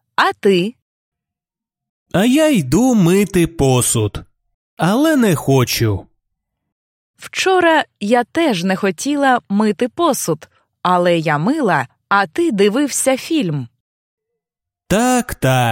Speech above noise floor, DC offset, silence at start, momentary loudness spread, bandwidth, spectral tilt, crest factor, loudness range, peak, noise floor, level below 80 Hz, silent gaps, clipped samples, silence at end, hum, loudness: 72 dB; under 0.1%; 0.2 s; 7 LU; 16.5 kHz; -5 dB/octave; 16 dB; 3 LU; 0 dBFS; -86 dBFS; -44 dBFS; 0.82-1.12 s, 1.89-2.06 s, 4.54-4.77 s, 6.72-7.14 s, 13.80-14.18 s; under 0.1%; 0 s; none; -16 LUFS